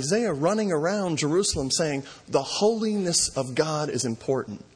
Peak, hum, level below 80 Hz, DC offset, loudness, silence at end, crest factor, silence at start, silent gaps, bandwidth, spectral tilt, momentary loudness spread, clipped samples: -8 dBFS; none; -52 dBFS; under 0.1%; -25 LUFS; 0.15 s; 16 dB; 0 s; none; 10.5 kHz; -4 dB/octave; 5 LU; under 0.1%